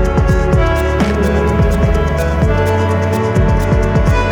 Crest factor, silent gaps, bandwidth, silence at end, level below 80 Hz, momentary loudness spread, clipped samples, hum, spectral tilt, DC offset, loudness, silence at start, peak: 12 dB; none; 18.5 kHz; 0 s; -16 dBFS; 2 LU; under 0.1%; none; -7.5 dB/octave; under 0.1%; -14 LUFS; 0 s; 0 dBFS